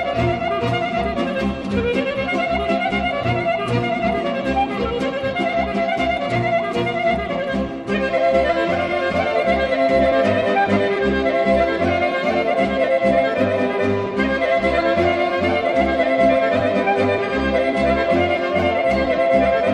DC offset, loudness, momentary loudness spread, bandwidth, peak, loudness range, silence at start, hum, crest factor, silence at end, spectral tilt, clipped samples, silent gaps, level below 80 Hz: under 0.1%; -19 LUFS; 5 LU; 10.5 kHz; -4 dBFS; 3 LU; 0 s; none; 14 dB; 0 s; -6.5 dB/octave; under 0.1%; none; -38 dBFS